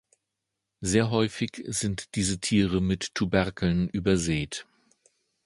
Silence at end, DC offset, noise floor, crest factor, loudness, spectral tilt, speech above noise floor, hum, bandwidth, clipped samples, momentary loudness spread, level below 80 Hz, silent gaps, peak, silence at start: 0.85 s; under 0.1%; -84 dBFS; 22 dB; -27 LUFS; -5 dB/octave; 58 dB; none; 11.5 kHz; under 0.1%; 6 LU; -46 dBFS; none; -6 dBFS; 0.8 s